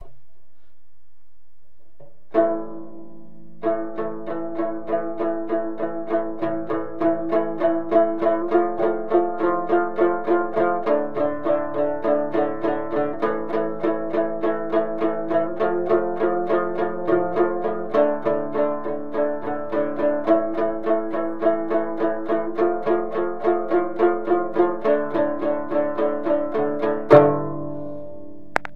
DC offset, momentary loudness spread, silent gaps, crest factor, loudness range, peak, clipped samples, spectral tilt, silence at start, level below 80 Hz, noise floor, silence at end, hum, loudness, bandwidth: 3%; 8 LU; none; 22 dB; 6 LU; 0 dBFS; under 0.1%; -8.5 dB/octave; 0 s; -60 dBFS; -66 dBFS; 0.05 s; none; -22 LUFS; 5.6 kHz